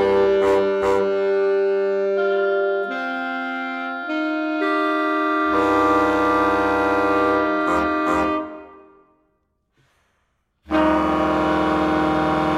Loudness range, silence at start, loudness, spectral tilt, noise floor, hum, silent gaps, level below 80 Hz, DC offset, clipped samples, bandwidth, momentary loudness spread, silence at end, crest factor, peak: 6 LU; 0 s; -20 LUFS; -6 dB/octave; -69 dBFS; none; none; -46 dBFS; under 0.1%; under 0.1%; 12 kHz; 8 LU; 0 s; 16 dB; -4 dBFS